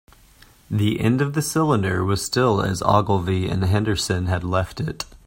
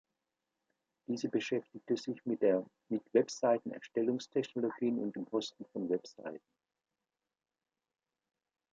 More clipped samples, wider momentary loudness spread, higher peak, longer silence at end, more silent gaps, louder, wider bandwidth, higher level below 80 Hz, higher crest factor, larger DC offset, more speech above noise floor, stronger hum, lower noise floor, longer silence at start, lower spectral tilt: neither; second, 5 LU vs 10 LU; first, 0 dBFS vs -14 dBFS; second, 0.2 s vs 2.35 s; neither; first, -21 LUFS vs -35 LUFS; first, 16.5 kHz vs 8.8 kHz; first, -44 dBFS vs -86 dBFS; about the same, 20 dB vs 22 dB; neither; second, 31 dB vs over 55 dB; neither; second, -51 dBFS vs under -90 dBFS; second, 0.7 s vs 1.1 s; about the same, -5.5 dB/octave vs -5.5 dB/octave